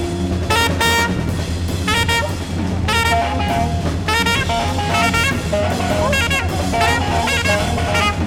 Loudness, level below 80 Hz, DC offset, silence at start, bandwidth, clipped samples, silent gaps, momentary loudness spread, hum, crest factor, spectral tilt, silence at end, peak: -17 LUFS; -28 dBFS; under 0.1%; 0 s; 18.5 kHz; under 0.1%; none; 6 LU; none; 14 dB; -4.5 dB/octave; 0 s; -4 dBFS